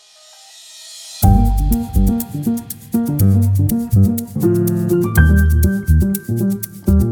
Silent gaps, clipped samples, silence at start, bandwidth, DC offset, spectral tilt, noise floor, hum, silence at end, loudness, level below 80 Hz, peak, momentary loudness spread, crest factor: none; under 0.1%; 0.75 s; over 20 kHz; under 0.1%; -7 dB/octave; -44 dBFS; none; 0 s; -16 LUFS; -20 dBFS; 0 dBFS; 8 LU; 14 dB